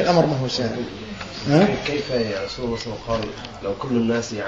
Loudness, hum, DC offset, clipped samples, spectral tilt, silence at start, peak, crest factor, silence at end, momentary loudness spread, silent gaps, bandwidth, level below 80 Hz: -23 LUFS; none; 0.2%; under 0.1%; -6 dB/octave; 0 s; -4 dBFS; 20 dB; 0 s; 13 LU; none; 7.8 kHz; -46 dBFS